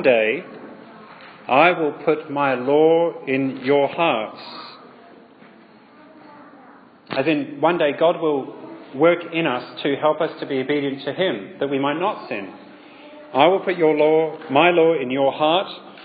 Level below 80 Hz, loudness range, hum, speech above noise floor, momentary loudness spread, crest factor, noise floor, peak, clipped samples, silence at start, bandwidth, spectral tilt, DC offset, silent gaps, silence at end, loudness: -76 dBFS; 7 LU; none; 29 dB; 16 LU; 20 dB; -48 dBFS; 0 dBFS; under 0.1%; 0 s; 5 kHz; -9.5 dB/octave; under 0.1%; none; 0 s; -20 LUFS